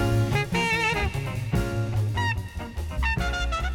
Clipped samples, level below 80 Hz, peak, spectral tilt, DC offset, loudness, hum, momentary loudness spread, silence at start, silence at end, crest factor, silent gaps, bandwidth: under 0.1%; -32 dBFS; -10 dBFS; -5.5 dB/octave; under 0.1%; -26 LUFS; none; 8 LU; 0 s; 0 s; 14 dB; none; 17 kHz